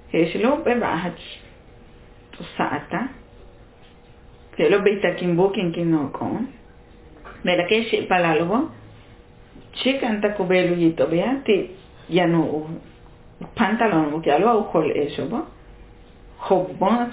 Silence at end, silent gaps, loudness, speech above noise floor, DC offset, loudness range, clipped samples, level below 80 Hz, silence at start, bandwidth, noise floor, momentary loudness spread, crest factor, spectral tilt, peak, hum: 0 s; none; -21 LUFS; 27 dB; under 0.1%; 5 LU; under 0.1%; -50 dBFS; 0.1 s; 4 kHz; -48 dBFS; 16 LU; 18 dB; -10 dB/octave; -4 dBFS; none